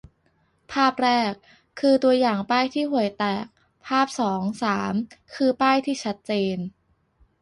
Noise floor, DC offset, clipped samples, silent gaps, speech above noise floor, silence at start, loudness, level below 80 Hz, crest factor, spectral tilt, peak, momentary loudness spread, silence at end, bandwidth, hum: -66 dBFS; under 0.1%; under 0.1%; none; 43 dB; 0.7 s; -23 LUFS; -62 dBFS; 16 dB; -5 dB/octave; -8 dBFS; 12 LU; 0.7 s; 11.5 kHz; none